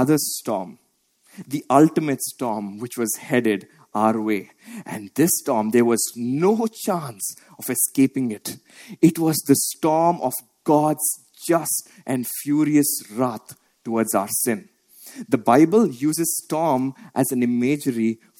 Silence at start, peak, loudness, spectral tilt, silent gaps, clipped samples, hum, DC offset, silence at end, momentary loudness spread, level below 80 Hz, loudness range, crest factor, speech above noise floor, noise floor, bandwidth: 0 s; -2 dBFS; -21 LUFS; -5 dB/octave; none; under 0.1%; none; under 0.1%; 0.25 s; 12 LU; -68 dBFS; 3 LU; 20 dB; 42 dB; -63 dBFS; 17 kHz